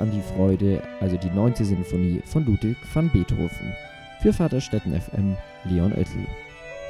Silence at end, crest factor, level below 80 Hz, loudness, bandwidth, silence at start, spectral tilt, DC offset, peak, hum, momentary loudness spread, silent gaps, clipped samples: 0 s; 20 dB; -36 dBFS; -24 LUFS; 12.5 kHz; 0 s; -8 dB/octave; under 0.1%; -4 dBFS; none; 12 LU; none; under 0.1%